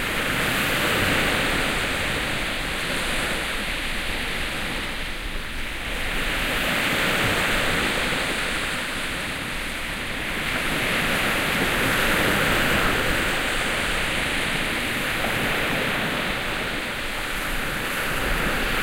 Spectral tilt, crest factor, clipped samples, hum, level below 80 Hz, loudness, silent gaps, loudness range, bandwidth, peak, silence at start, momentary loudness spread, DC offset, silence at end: -3 dB/octave; 16 dB; under 0.1%; none; -34 dBFS; -23 LUFS; none; 5 LU; 16 kHz; -10 dBFS; 0 s; 7 LU; under 0.1%; 0 s